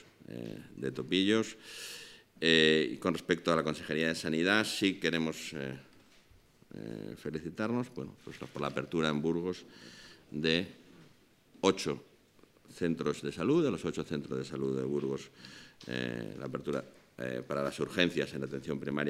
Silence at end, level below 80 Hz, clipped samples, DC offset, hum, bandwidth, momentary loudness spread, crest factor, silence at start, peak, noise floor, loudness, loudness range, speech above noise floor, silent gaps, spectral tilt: 0 s; -68 dBFS; under 0.1%; under 0.1%; none; 16 kHz; 17 LU; 24 dB; 0.2 s; -10 dBFS; -63 dBFS; -33 LUFS; 8 LU; 30 dB; none; -4.5 dB/octave